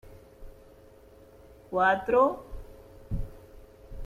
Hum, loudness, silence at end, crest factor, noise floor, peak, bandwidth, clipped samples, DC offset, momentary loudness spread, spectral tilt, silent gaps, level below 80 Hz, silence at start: none; -27 LUFS; 0 s; 20 dB; -54 dBFS; -12 dBFS; 14.5 kHz; under 0.1%; under 0.1%; 25 LU; -7 dB/octave; none; -44 dBFS; 0.05 s